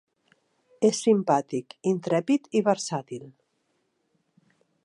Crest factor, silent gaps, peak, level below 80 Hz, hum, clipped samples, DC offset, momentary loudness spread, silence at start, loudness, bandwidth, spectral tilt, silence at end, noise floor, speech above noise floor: 20 dB; none; -8 dBFS; -80 dBFS; none; under 0.1%; under 0.1%; 12 LU; 0.8 s; -25 LUFS; 11.5 kHz; -5.5 dB/octave; 1.55 s; -73 dBFS; 49 dB